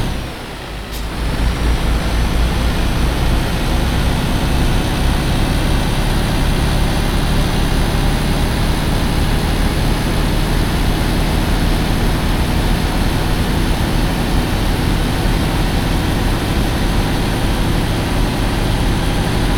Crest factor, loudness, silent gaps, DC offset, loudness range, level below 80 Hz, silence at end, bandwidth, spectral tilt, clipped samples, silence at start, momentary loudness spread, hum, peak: 12 dB; -17 LUFS; none; under 0.1%; 0 LU; -18 dBFS; 0 s; 18.5 kHz; -5.5 dB/octave; under 0.1%; 0 s; 1 LU; none; -4 dBFS